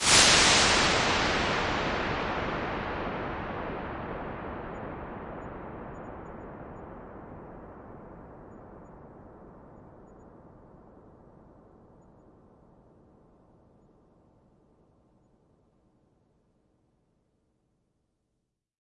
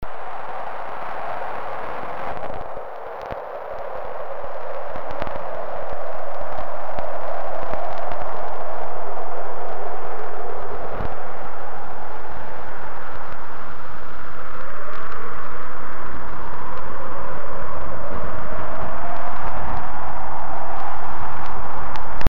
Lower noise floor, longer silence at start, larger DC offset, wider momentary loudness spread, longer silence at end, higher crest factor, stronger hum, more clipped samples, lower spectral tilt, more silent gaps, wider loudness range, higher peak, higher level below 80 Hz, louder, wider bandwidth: first, -81 dBFS vs -36 dBFS; about the same, 0 s vs 0 s; second, under 0.1% vs 30%; first, 28 LU vs 5 LU; first, 7.85 s vs 0 s; first, 28 dB vs 10 dB; neither; neither; second, -2 dB/octave vs -7.5 dB/octave; neither; first, 27 LU vs 5 LU; second, -6 dBFS vs -2 dBFS; second, -50 dBFS vs -42 dBFS; first, -26 LUFS vs -31 LUFS; second, 11.5 kHz vs 17.5 kHz